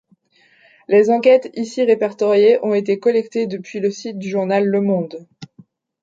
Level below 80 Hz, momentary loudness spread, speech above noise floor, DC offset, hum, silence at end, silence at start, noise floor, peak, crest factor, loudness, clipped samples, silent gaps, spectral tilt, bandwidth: -70 dBFS; 11 LU; 40 dB; under 0.1%; none; 0.55 s; 0.9 s; -56 dBFS; -2 dBFS; 16 dB; -17 LUFS; under 0.1%; none; -6.5 dB/octave; 7.8 kHz